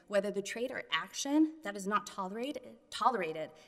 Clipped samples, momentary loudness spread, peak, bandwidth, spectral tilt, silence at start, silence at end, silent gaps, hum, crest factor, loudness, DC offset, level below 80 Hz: under 0.1%; 10 LU; -14 dBFS; 13.5 kHz; -3.5 dB/octave; 0.1 s; 0.05 s; none; none; 22 dB; -35 LUFS; under 0.1%; -76 dBFS